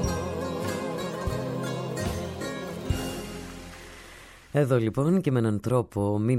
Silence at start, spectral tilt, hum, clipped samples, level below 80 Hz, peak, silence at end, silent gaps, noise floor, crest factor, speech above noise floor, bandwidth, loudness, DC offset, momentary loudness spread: 0 s; -6.5 dB/octave; none; under 0.1%; -44 dBFS; -10 dBFS; 0 s; none; -48 dBFS; 18 dB; 24 dB; 16 kHz; -28 LUFS; under 0.1%; 18 LU